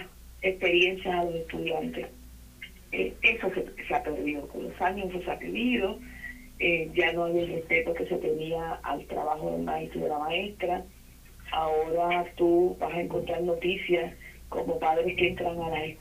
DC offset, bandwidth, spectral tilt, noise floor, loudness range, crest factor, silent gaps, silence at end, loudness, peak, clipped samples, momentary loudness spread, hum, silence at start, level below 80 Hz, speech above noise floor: under 0.1%; 15.5 kHz; -5.5 dB/octave; -50 dBFS; 3 LU; 20 dB; none; 0 s; -29 LUFS; -10 dBFS; under 0.1%; 13 LU; none; 0 s; -50 dBFS; 21 dB